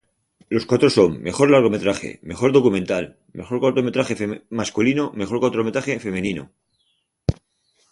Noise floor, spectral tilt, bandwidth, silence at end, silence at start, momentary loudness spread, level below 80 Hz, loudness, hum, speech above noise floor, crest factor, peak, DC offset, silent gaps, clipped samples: -69 dBFS; -6 dB/octave; 11.5 kHz; 0.6 s; 0.5 s; 12 LU; -46 dBFS; -20 LUFS; none; 49 dB; 18 dB; -2 dBFS; under 0.1%; none; under 0.1%